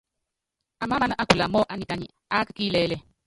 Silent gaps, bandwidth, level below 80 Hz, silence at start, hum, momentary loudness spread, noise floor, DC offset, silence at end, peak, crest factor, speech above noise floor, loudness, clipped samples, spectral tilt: none; 11.5 kHz; -50 dBFS; 0.8 s; none; 11 LU; -84 dBFS; under 0.1%; 0.25 s; -2 dBFS; 24 dB; 59 dB; -25 LUFS; under 0.1%; -5 dB/octave